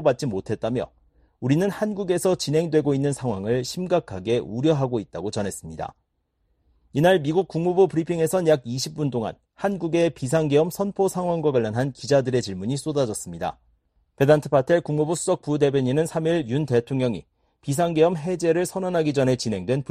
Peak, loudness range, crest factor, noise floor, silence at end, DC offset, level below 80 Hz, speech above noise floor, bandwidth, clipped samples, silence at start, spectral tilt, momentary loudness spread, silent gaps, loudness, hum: -4 dBFS; 3 LU; 18 dB; -71 dBFS; 0.1 s; under 0.1%; -56 dBFS; 49 dB; 14 kHz; under 0.1%; 0 s; -6 dB/octave; 9 LU; none; -23 LUFS; none